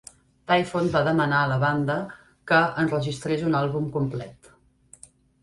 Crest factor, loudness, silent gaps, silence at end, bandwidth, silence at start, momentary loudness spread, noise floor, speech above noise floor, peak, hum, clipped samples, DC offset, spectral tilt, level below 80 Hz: 18 dB; -24 LUFS; none; 1.1 s; 11.5 kHz; 0.5 s; 14 LU; -57 dBFS; 33 dB; -6 dBFS; none; under 0.1%; under 0.1%; -6.5 dB/octave; -56 dBFS